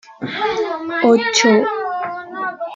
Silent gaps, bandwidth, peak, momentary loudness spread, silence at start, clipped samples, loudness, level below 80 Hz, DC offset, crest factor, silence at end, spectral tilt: none; 9.2 kHz; 0 dBFS; 13 LU; 0.1 s; under 0.1%; -17 LUFS; -60 dBFS; under 0.1%; 16 dB; 0 s; -3 dB/octave